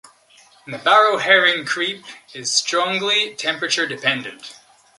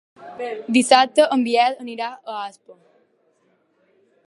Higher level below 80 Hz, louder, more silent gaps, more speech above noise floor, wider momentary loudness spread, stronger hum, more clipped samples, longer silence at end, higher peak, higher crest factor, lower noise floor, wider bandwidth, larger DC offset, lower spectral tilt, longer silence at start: about the same, -74 dBFS vs -78 dBFS; about the same, -17 LUFS vs -19 LUFS; neither; second, 32 dB vs 44 dB; first, 20 LU vs 17 LU; neither; neither; second, 0.45 s vs 1.55 s; about the same, -2 dBFS vs 0 dBFS; about the same, 18 dB vs 22 dB; second, -52 dBFS vs -64 dBFS; about the same, 11.5 kHz vs 11.5 kHz; neither; second, -1 dB/octave vs -2.5 dB/octave; first, 0.65 s vs 0.2 s